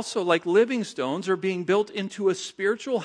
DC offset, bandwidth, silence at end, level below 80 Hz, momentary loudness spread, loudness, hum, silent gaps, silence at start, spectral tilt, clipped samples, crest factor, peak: under 0.1%; 10.5 kHz; 0 s; -76 dBFS; 7 LU; -25 LUFS; none; none; 0 s; -4.5 dB/octave; under 0.1%; 18 dB; -6 dBFS